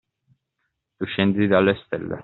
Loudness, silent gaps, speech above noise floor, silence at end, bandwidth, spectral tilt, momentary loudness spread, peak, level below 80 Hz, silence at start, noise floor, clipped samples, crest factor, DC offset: -21 LUFS; none; 56 dB; 0 s; 4.3 kHz; -5 dB/octave; 11 LU; -4 dBFS; -60 dBFS; 1 s; -77 dBFS; under 0.1%; 20 dB; under 0.1%